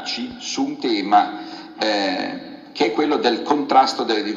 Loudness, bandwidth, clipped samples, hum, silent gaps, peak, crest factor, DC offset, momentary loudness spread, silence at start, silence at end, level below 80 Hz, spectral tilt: -20 LUFS; 7.8 kHz; under 0.1%; none; none; -2 dBFS; 18 dB; under 0.1%; 13 LU; 0 s; 0 s; -64 dBFS; -3.5 dB/octave